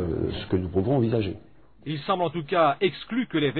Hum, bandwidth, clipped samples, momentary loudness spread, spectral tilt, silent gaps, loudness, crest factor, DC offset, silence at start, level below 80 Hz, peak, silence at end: none; 4.6 kHz; under 0.1%; 11 LU; -10.5 dB/octave; none; -26 LUFS; 18 dB; 0.2%; 0 s; -48 dBFS; -8 dBFS; 0 s